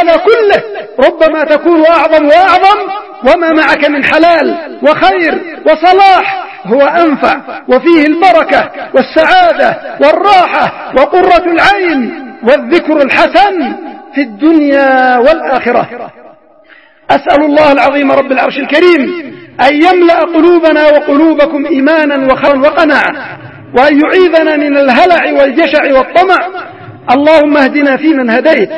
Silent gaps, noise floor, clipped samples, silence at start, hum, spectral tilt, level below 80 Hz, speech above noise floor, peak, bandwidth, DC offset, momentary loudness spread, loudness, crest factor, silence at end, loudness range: none; -40 dBFS; 2%; 0 s; none; -5.5 dB/octave; -42 dBFS; 33 dB; 0 dBFS; 11 kHz; 0.5%; 8 LU; -7 LUFS; 8 dB; 0 s; 2 LU